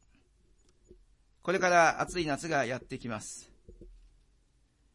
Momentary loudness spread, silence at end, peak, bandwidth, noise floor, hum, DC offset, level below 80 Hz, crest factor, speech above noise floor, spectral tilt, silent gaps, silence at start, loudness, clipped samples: 16 LU; 1 s; -10 dBFS; 11.5 kHz; -68 dBFS; none; under 0.1%; -58 dBFS; 22 dB; 39 dB; -4 dB/octave; none; 1.45 s; -30 LUFS; under 0.1%